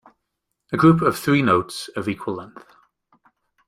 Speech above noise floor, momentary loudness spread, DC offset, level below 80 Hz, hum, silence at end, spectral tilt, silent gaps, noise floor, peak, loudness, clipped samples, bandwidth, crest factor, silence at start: 58 dB; 14 LU; under 0.1%; -54 dBFS; none; 1.2 s; -6.5 dB/octave; none; -78 dBFS; -2 dBFS; -20 LUFS; under 0.1%; 15 kHz; 20 dB; 0.7 s